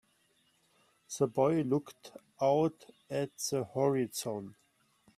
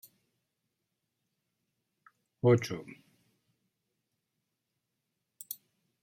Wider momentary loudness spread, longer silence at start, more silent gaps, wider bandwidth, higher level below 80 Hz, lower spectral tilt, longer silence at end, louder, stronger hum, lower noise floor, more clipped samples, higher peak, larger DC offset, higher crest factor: second, 19 LU vs 24 LU; second, 1.1 s vs 2.45 s; neither; about the same, 15.5 kHz vs 16 kHz; about the same, -76 dBFS vs -78 dBFS; second, -5.5 dB/octave vs -7 dB/octave; first, 0.65 s vs 0.5 s; second, -33 LUFS vs -30 LUFS; neither; second, -72 dBFS vs -85 dBFS; neither; second, -16 dBFS vs -12 dBFS; neither; second, 20 dB vs 26 dB